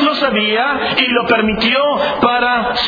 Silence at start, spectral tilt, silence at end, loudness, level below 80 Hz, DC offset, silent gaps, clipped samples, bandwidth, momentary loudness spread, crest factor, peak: 0 s; -5.5 dB/octave; 0 s; -13 LUFS; -42 dBFS; under 0.1%; none; under 0.1%; 5.4 kHz; 2 LU; 14 dB; 0 dBFS